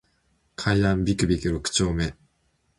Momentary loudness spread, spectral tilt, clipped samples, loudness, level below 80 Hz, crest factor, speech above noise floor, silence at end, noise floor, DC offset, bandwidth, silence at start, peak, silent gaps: 8 LU; -5 dB/octave; under 0.1%; -24 LUFS; -38 dBFS; 18 dB; 46 dB; 0.65 s; -69 dBFS; under 0.1%; 11.5 kHz; 0.6 s; -8 dBFS; none